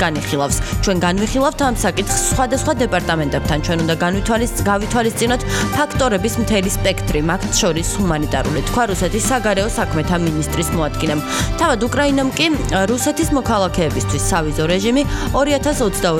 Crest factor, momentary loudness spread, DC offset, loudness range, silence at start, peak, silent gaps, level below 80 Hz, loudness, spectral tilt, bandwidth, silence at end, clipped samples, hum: 16 dB; 3 LU; under 0.1%; 1 LU; 0 s; -2 dBFS; none; -28 dBFS; -17 LUFS; -4.5 dB/octave; 17.5 kHz; 0 s; under 0.1%; none